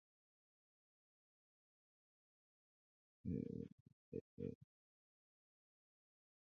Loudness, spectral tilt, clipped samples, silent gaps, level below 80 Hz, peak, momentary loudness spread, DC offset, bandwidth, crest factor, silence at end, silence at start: -51 LUFS; -12 dB/octave; under 0.1%; 3.72-3.86 s, 3.93-4.12 s, 4.21-4.37 s, 4.55-4.61 s; -72 dBFS; -32 dBFS; 9 LU; under 0.1%; 6.4 kHz; 24 dB; 1.85 s; 3.25 s